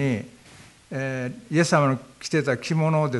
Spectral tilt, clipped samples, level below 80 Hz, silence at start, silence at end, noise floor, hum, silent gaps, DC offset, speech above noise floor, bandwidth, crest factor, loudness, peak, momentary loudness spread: -6 dB/octave; under 0.1%; -64 dBFS; 0 s; 0 s; -50 dBFS; none; none; under 0.1%; 26 dB; 11.5 kHz; 20 dB; -24 LUFS; -4 dBFS; 11 LU